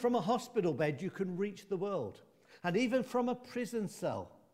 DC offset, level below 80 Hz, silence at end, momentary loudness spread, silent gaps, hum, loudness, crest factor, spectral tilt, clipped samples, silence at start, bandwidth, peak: under 0.1%; -76 dBFS; 0.25 s; 7 LU; none; none; -36 LUFS; 16 dB; -6 dB/octave; under 0.1%; 0 s; 16 kHz; -20 dBFS